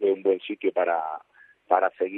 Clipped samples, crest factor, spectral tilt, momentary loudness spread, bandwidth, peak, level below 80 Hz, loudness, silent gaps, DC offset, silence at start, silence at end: under 0.1%; 20 dB; -8 dB/octave; 9 LU; 4 kHz; -6 dBFS; -86 dBFS; -25 LUFS; none; under 0.1%; 0 s; 0 s